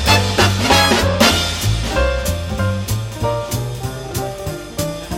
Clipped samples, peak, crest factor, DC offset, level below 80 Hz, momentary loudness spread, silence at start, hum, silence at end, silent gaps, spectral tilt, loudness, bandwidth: under 0.1%; 0 dBFS; 18 dB; under 0.1%; -28 dBFS; 12 LU; 0 s; none; 0 s; none; -4 dB/octave; -17 LUFS; 17 kHz